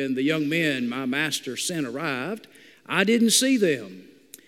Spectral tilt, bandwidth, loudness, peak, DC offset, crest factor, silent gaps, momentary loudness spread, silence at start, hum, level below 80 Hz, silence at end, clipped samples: -3 dB/octave; 16 kHz; -23 LUFS; -4 dBFS; under 0.1%; 20 dB; none; 12 LU; 0 s; none; -76 dBFS; 0.45 s; under 0.1%